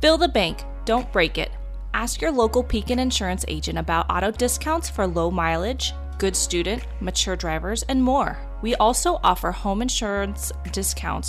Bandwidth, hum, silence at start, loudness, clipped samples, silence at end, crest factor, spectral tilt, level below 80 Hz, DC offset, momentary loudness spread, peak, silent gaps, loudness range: 15.5 kHz; none; 0 s; -23 LUFS; under 0.1%; 0 s; 18 dB; -3.5 dB/octave; -32 dBFS; under 0.1%; 7 LU; -6 dBFS; none; 1 LU